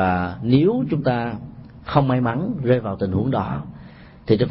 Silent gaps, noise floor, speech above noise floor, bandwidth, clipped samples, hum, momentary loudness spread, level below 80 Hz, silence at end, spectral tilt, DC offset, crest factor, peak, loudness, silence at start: none; -42 dBFS; 22 dB; 5.8 kHz; under 0.1%; none; 19 LU; -46 dBFS; 0 s; -12.5 dB/octave; under 0.1%; 16 dB; -4 dBFS; -21 LUFS; 0 s